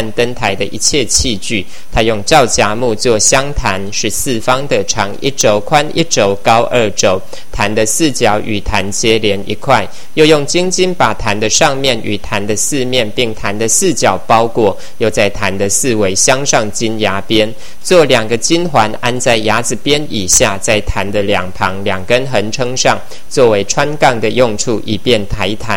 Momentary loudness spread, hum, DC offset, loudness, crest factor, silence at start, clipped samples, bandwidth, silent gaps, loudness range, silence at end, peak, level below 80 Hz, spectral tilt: 7 LU; none; 10%; -12 LUFS; 14 dB; 0 s; 0.8%; over 20 kHz; none; 1 LU; 0 s; 0 dBFS; -32 dBFS; -3 dB/octave